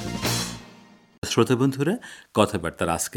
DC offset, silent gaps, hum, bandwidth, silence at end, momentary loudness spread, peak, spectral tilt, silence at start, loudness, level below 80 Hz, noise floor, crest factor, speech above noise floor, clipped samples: under 0.1%; 1.18-1.22 s; none; 19.5 kHz; 0 s; 11 LU; -2 dBFS; -4.5 dB/octave; 0 s; -24 LUFS; -50 dBFS; -51 dBFS; 24 dB; 28 dB; under 0.1%